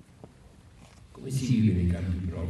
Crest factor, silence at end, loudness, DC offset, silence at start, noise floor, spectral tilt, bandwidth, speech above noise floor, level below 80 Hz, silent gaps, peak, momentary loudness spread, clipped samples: 16 dB; 0 s; -27 LUFS; under 0.1%; 0.25 s; -53 dBFS; -7.5 dB/octave; 12.5 kHz; 27 dB; -44 dBFS; none; -12 dBFS; 10 LU; under 0.1%